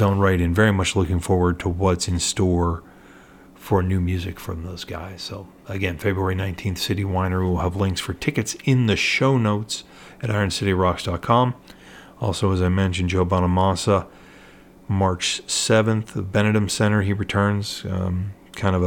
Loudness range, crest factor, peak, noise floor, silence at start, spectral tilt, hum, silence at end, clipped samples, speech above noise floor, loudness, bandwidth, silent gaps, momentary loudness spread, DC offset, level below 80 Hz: 5 LU; 18 dB; -4 dBFS; -47 dBFS; 0 s; -5.5 dB/octave; none; 0 s; under 0.1%; 26 dB; -22 LUFS; 17 kHz; none; 13 LU; under 0.1%; -46 dBFS